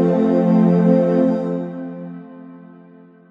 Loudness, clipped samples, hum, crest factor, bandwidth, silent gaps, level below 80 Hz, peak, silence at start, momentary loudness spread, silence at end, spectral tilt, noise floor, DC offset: -16 LUFS; under 0.1%; none; 14 dB; 5 kHz; none; -68 dBFS; -4 dBFS; 0 s; 20 LU; 0.7 s; -10.5 dB/octave; -45 dBFS; under 0.1%